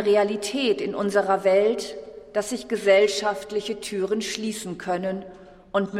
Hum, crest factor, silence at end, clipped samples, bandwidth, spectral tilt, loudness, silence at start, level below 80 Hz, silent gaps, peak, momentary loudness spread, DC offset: none; 18 dB; 0 s; under 0.1%; 15 kHz; -4 dB/octave; -24 LUFS; 0 s; -60 dBFS; none; -6 dBFS; 11 LU; under 0.1%